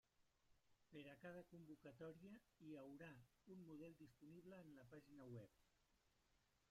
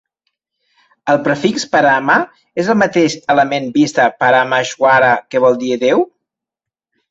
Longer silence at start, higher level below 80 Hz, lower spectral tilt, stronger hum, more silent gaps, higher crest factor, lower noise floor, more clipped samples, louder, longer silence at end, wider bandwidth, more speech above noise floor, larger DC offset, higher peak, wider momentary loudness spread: second, 0.2 s vs 1.05 s; second, -86 dBFS vs -58 dBFS; first, -7 dB/octave vs -4.5 dB/octave; neither; neither; about the same, 16 dB vs 14 dB; about the same, -84 dBFS vs -85 dBFS; neither; second, -63 LUFS vs -13 LUFS; second, 0.05 s vs 1.05 s; first, 15 kHz vs 8 kHz; second, 22 dB vs 72 dB; neither; second, -48 dBFS vs 0 dBFS; about the same, 6 LU vs 5 LU